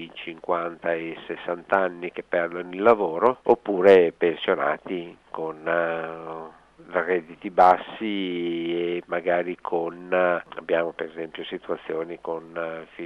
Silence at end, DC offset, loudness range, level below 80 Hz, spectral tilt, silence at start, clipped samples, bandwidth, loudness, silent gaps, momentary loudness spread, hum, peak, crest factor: 0 s; under 0.1%; 6 LU; -66 dBFS; -7 dB/octave; 0 s; under 0.1%; 6.4 kHz; -24 LUFS; none; 15 LU; none; -4 dBFS; 20 dB